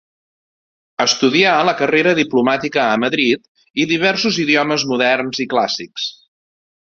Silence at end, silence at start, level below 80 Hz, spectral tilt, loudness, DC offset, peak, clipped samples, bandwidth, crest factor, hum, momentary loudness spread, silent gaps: 0.7 s; 1 s; -60 dBFS; -3.5 dB/octave; -16 LUFS; under 0.1%; 0 dBFS; under 0.1%; 7.6 kHz; 16 dB; none; 9 LU; 3.48-3.55 s, 3.70-3.74 s